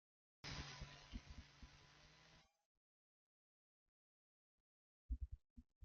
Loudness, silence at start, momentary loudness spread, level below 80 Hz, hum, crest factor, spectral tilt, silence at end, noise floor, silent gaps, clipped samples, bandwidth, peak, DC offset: -56 LUFS; 0.45 s; 14 LU; -60 dBFS; none; 22 dB; -3.5 dB/octave; 0 s; under -90 dBFS; 2.65-5.09 s, 5.50-5.56 s, 5.76-5.81 s; under 0.1%; 7.2 kHz; -38 dBFS; under 0.1%